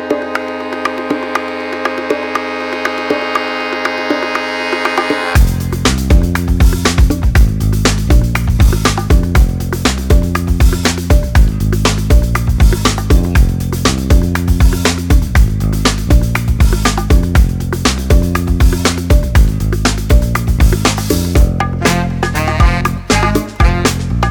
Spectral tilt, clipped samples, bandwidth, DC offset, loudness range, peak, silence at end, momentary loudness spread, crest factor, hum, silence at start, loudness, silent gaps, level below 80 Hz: -5 dB/octave; under 0.1%; 19 kHz; under 0.1%; 4 LU; 0 dBFS; 0 s; 6 LU; 12 dB; none; 0 s; -13 LUFS; none; -14 dBFS